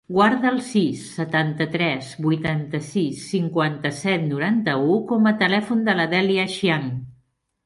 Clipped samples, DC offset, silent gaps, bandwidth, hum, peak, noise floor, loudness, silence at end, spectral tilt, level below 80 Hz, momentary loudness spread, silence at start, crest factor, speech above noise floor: under 0.1%; under 0.1%; none; 11.5 kHz; none; -4 dBFS; -64 dBFS; -21 LUFS; 0.55 s; -6 dB/octave; -60 dBFS; 7 LU; 0.1 s; 16 dB; 43 dB